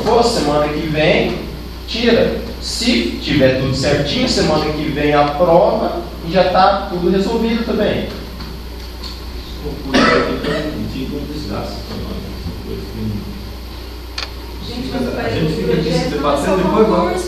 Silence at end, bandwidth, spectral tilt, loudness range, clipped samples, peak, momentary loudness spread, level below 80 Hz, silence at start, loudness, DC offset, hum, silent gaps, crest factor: 0 s; 14 kHz; -5.5 dB/octave; 11 LU; under 0.1%; 0 dBFS; 15 LU; -30 dBFS; 0 s; -16 LUFS; under 0.1%; none; none; 16 dB